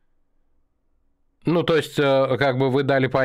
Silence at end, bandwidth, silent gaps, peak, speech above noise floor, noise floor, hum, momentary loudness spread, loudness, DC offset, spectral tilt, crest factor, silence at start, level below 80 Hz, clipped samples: 0 s; 15.5 kHz; none; -6 dBFS; 45 dB; -65 dBFS; none; 4 LU; -20 LUFS; under 0.1%; -6.5 dB/octave; 16 dB; 1.45 s; -56 dBFS; under 0.1%